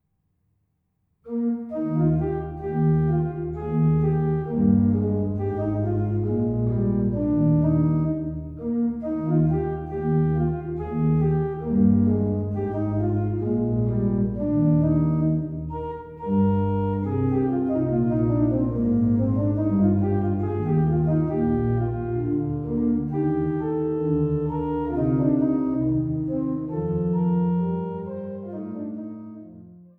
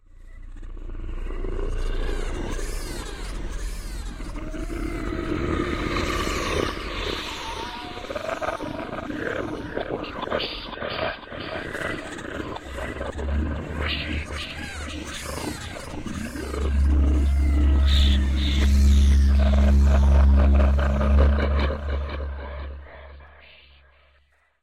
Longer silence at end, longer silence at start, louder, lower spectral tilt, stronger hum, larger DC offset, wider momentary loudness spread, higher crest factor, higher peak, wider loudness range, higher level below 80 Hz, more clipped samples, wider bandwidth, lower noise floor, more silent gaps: second, 0.15 s vs 1.2 s; first, 1.25 s vs 0.2 s; about the same, -24 LUFS vs -25 LUFS; first, -13 dB/octave vs -6 dB/octave; neither; neither; second, 8 LU vs 16 LU; about the same, 14 dB vs 14 dB; about the same, -8 dBFS vs -8 dBFS; second, 3 LU vs 13 LU; second, -42 dBFS vs -24 dBFS; neither; second, 3 kHz vs 12 kHz; first, -72 dBFS vs -63 dBFS; neither